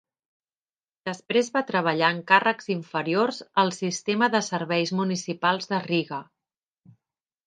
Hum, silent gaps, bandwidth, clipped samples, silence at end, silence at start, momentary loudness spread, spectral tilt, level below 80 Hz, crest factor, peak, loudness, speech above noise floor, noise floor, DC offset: none; none; 9.6 kHz; under 0.1%; 1.25 s; 1.05 s; 9 LU; -4.5 dB/octave; -76 dBFS; 24 dB; -2 dBFS; -24 LUFS; over 65 dB; under -90 dBFS; under 0.1%